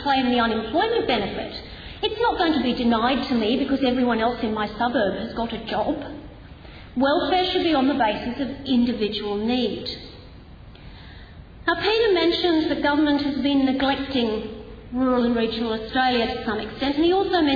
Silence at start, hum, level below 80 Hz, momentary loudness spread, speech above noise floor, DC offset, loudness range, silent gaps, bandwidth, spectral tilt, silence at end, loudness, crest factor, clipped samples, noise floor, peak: 0 s; none; -44 dBFS; 13 LU; 21 dB; under 0.1%; 4 LU; none; 5 kHz; -6.5 dB/octave; 0 s; -22 LUFS; 16 dB; under 0.1%; -43 dBFS; -8 dBFS